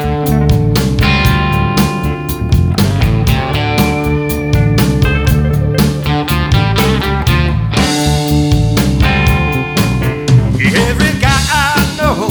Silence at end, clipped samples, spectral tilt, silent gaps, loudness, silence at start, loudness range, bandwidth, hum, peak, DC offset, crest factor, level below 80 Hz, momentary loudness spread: 0 s; under 0.1%; -5.5 dB/octave; none; -12 LUFS; 0 s; 1 LU; over 20 kHz; none; 0 dBFS; under 0.1%; 12 dB; -20 dBFS; 3 LU